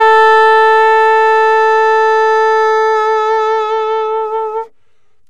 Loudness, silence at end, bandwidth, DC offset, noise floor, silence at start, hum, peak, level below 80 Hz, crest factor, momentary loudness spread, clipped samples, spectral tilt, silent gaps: -10 LUFS; 0.6 s; 9.8 kHz; 1%; -63 dBFS; 0 s; none; -2 dBFS; -62 dBFS; 8 dB; 10 LU; under 0.1%; -0.5 dB/octave; none